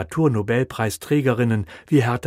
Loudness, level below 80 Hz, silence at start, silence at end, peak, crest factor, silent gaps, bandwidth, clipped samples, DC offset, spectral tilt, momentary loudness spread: -21 LUFS; -50 dBFS; 0 s; 0 s; -6 dBFS; 14 dB; none; 16 kHz; under 0.1%; under 0.1%; -7 dB/octave; 5 LU